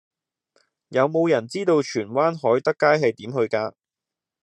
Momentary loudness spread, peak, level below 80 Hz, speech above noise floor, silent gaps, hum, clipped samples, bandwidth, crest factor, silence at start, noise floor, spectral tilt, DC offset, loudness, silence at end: 7 LU; -4 dBFS; -74 dBFS; 67 dB; none; none; under 0.1%; 10 kHz; 20 dB; 0.9 s; -88 dBFS; -6 dB/octave; under 0.1%; -22 LUFS; 0.75 s